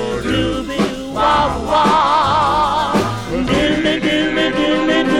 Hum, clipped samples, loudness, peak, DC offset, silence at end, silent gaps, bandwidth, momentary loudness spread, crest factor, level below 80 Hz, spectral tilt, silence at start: none; under 0.1%; -15 LUFS; -4 dBFS; under 0.1%; 0 s; none; 15 kHz; 6 LU; 12 dB; -34 dBFS; -5 dB/octave; 0 s